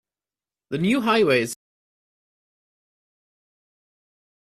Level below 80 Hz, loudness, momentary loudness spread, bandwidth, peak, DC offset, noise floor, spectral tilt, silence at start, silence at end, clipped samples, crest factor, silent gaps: -66 dBFS; -21 LUFS; 14 LU; 15 kHz; -6 dBFS; under 0.1%; under -90 dBFS; -5 dB/octave; 0.7 s; 3.05 s; under 0.1%; 20 dB; none